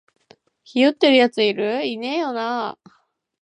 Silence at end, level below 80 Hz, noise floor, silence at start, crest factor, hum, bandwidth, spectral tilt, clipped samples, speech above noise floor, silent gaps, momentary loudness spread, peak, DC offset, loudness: 0.7 s; -76 dBFS; -55 dBFS; 0.75 s; 18 dB; none; 10 kHz; -4.5 dB/octave; under 0.1%; 36 dB; none; 12 LU; -4 dBFS; under 0.1%; -19 LUFS